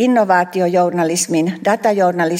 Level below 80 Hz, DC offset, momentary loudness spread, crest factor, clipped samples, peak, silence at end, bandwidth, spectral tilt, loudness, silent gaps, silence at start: -66 dBFS; under 0.1%; 4 LU; 12 dB; under 0.1%; -2 dBFS; 0 s; 16.5 kHz; -4.5 dB/octave; -15 LUFS; none; 0 s